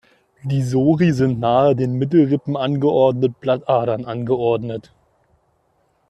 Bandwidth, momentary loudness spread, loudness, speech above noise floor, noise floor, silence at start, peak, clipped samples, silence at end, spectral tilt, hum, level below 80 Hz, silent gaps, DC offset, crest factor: 10 kHz; 8 LU; -18 LUFS; 46 dB; -63 dBFS; 0.45 s; -4 dBFS; under 0.1%; 1.3 s; -8.5 dB/octave; none; -54 dBFS; none; under 0.1%; 16 dB